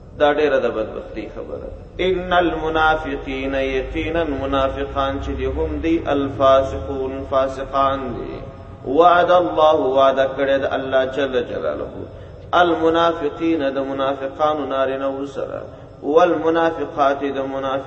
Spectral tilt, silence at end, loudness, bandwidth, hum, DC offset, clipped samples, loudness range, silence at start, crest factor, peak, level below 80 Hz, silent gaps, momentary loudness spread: -6.5 dB/octave; 0 s; -19 LUFS; 8 kHz; none; under 0.1%; under 0.1%; 4 LU; 0 s; 18 dB; 0 dBFS; -38 dBFS; none; 15 LU